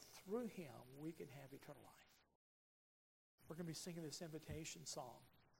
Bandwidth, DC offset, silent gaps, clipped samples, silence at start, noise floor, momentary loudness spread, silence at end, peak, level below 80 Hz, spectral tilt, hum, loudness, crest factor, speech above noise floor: 16 kHz; under 0.1%; 2.35-3.38 s; under 0.1%; 0 s; under -90 dBFS; 12 LU; 0 s; -36 dBFS; -78 dBFS; -4.5 dB/octave; none; -53 LUFS; 20 dB; over 37 dB